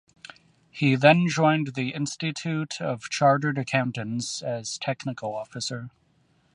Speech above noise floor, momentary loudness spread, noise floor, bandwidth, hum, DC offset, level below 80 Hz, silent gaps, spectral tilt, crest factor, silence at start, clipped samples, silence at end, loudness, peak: 40 dB; 13 LU; -65 dBFS; 11 kHz; none; under 0.1%; -68 dBFS; none; -5 dB/octave; 22 dB; 0.75 s; under 0.1%; 0.65 s; -25 LUFS; -2 dBFS